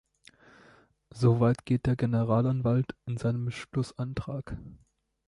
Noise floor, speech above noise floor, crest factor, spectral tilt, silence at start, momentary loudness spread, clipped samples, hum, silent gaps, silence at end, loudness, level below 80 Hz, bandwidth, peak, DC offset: -60 dBFS; 32 dB; 18 dB; -8.5 dB/octave; 1.15 s; 11 LU; under 0.1%; none; none; 0.55 s; -29 LUFS; -52 dBFS; 11 kHz; -12 dBFS; under 0.1%